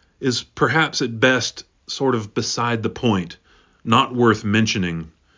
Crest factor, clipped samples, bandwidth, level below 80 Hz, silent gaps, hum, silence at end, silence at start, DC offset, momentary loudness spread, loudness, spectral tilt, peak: 20 dB; under 0.1%; 7.6 kHz; -50 dBFS; none; none; 0.3 s; 0.2 s; under 0.1%; 11 LU; -20 LUFS; -4.5 dB/octave; -2 dBFS